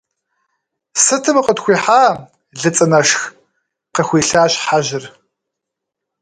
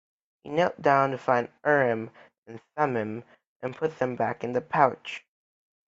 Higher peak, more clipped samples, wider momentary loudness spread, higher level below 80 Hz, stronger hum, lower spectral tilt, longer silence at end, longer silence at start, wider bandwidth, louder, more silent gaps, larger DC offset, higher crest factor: first, 0 dBFS vs -4 dBFS; neither; second, 12 LU vs 18 LU; first, -56 dBFS vs -70 dBFS; neither; second, -3 dB/octave vs -6.5 dB/octave; first, 1.15 s vs 0.7 s; first, 0.95 s vs 0.45 s; first, 11 kHz vs 7.8 kHz; first, -14 LUFS vs -26 LUFS; second, none vs 2.38-2.43 s, 3.47-3.60 s; neither; second, 16 dB vs 24 dB